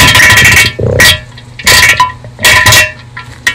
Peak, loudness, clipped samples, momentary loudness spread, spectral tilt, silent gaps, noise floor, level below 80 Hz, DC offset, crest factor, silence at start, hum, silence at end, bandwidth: 0 dBFS; -4 LUFS; 4%; 11 LU; -1.5 dB/octave; none; -27 dBFS; -26 dBFS; under 0.1%; 6 dB; 0 s; none; 0 s; over 20 kHz